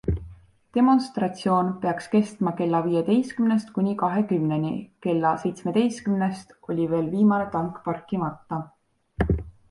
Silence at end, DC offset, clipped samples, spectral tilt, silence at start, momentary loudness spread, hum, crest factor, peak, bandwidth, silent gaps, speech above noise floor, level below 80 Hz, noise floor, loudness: 0.2 s; under 0.1%; under 0.1%; -7.5 dB/octave; 0.05 s; 9 LU; none; 16 dB; -8 dBFS; 11.5 kHz; none; 23 dB; -42 dBFS; -47 dBFS; -25 LUFS